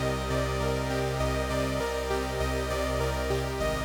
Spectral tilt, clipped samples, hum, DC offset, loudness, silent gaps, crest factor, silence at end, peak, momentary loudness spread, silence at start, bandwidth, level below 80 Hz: -5 dB/octave; under 0.1%; none; under 0.1%; -29 LUFS; none; 12 dB; 0 s; -16 dBFS; 1 LU; 0 s; over 20 kHz; -36 dBFS